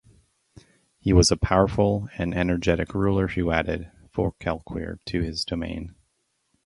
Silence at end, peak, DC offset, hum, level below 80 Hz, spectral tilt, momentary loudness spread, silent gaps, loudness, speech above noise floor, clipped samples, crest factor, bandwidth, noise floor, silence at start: 0.75 s; -4 dBFS; under 0.1%; none; -36 dBFS; -5.5 dB/octave; 14 LU; none; -24 LUFS; 49 dB; under 0.1%; 22 dB; 11.5 kHz; -73 dBFS; 1.05 s